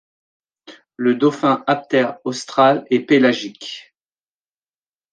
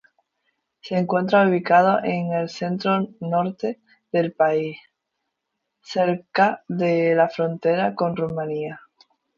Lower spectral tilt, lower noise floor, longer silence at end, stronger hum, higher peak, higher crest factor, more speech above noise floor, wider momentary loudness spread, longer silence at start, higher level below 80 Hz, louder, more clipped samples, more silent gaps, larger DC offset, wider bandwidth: second, -5.5 dB/octave vs -7.5 dB/octave; first, under -90 dBFS vs -79 dBFS; first, 1.3 s vs 0.6 s; neither; about the same, -2 dBFS vs -2 dBFS; about the same, 18 dB vs 20 dB; first, over 73 dB vs 58 dB; first, 15 LU vs 12 LU; second, 0.7 s vs 0.85 s; about the same, -70 dBFS vs -68 dBFS; first, -17 LUFS vs -22 LUFS; neither; neither; neither; first, 9.2 kHz vs 7.4 kHz